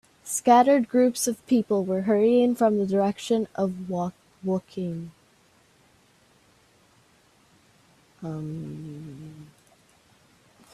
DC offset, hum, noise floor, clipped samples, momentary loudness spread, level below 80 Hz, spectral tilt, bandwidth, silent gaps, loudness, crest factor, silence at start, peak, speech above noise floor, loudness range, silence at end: under 0.1%; none; -61 dBFS; under 0.1%; 20 LU; -66 dBFS; -5.5 dB/octave; 15 kHz; none; -24 LUFS; 20 dB; 0.25 s; -6 dBFS; 37 dB; 20 LU; 1.3 s